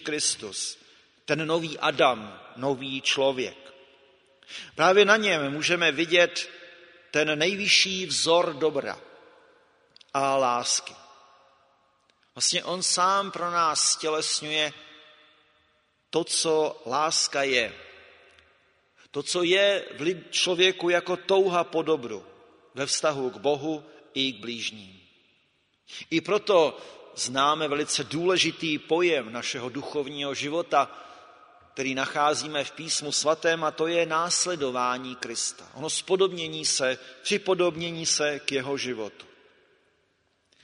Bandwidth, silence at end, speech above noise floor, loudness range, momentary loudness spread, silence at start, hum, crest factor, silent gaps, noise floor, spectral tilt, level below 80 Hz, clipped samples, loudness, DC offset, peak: 11 kHz; 1.4 s; 44 dB; 5 LU; 12 LU; 0 s; none; 24 dB; none; -70 dBFS; -2 dB/octave; -72 dBFS; under 0.1%; -25 LUFS; under 0.1%; -4 dBFS